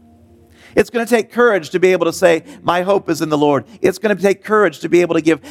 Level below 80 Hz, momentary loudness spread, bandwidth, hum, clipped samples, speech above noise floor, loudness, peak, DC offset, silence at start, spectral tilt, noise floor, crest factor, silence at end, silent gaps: -56 dBFS; 4 LU; 16 kHz; none; under 0.1%; 32 dB; -15 LUFS; 0 dBFS; under 0.1%; 0.75 s; -5.5 dB/octave; -47 dBFS; 16 dB; 0 s; none